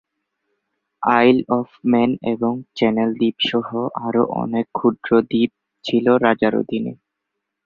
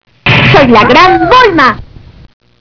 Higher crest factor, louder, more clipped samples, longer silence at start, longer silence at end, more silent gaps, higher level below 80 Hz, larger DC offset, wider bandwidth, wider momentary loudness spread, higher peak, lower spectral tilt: first, 18 dB vs 6 dB; second, -19 LUFS vs -4 LUFS; second, under 0.1% vs 7%; first, 1 s vs 0.25 s; about the same, 0.7 s vs 0.75 s; neither; second, -60 dBFS vs -30 dBFS; neither; first, 6.8 kHz vs 5.4 kHz; first, 9 LU vs 5 LU; about the same, -2 dBFS vs 0 dBFS; first, -7.5 dB/octave vs -6 dB/octave